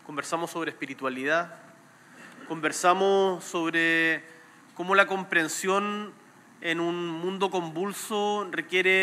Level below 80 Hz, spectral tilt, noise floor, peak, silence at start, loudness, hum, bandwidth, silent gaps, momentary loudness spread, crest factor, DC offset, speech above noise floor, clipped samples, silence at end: under -90 dBFS; -3.5 dB/octave; -53 dBFS; -4 dBFS; 0.05 s; -26 LUFS; none; 16 kHz; none; 11 LU; 22 dB; under 0.1%; 26 dB; under 0.1%; 0 s